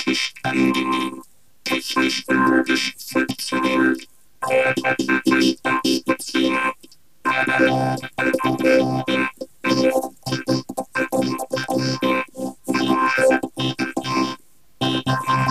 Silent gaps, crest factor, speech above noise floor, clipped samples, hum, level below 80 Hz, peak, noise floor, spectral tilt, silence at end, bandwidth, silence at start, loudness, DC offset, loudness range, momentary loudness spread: none; 16 dB; 32 dB; under 0.1%; none; -56 dBFS; -4 dBFS; -52 dBFS; -4.5 dB/octave; 0 s; 15 kHz; 0 s; -20 LUFS; 0.4%; 2 LU; 9 LU